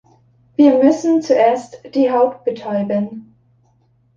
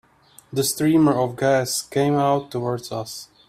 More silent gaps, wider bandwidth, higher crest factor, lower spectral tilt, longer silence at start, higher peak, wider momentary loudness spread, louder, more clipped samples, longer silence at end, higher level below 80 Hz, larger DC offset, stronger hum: neither; second, 7.6 kHz vs 16 kHz; about the same, 14 dB vs 18 dB; first, -6.5 dB/octave vs -5 dB/octave; about the same, 0.6 s vs 0.5 s; about the same, -2 dBFS vs -4 dBFS; about the same, 12 LU vs 12 LU; first, -16 LUFS vs -21 LUFS; neither; first, 0.95 s vs 0.25 s; about the same, -62 dBFS vs -58 dBFS; neither; neither